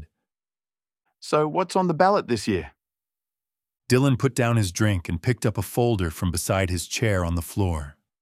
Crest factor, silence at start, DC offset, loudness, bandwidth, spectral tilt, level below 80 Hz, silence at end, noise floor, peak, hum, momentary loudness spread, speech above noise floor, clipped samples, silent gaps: 22 dB; 0 s; under 0.1%; -24 LUFS; 15.5 kHz; -5.5 dB/octave; -44 dBFS; 0.3 s; under -90 dBFS; -4 dBFS; none; 7 LU; over 67 dB; under 0.1%; none